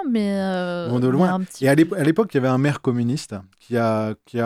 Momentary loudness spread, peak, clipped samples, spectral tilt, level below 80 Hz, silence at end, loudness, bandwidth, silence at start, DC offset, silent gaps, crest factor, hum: 9 LU; -4 dBFS; under 0.1%; -7 dB/octave; -62 dBFS; 0 s; -21 LUFS; 15 kHz; 0 s; under 0.1%; none; 16 dB; none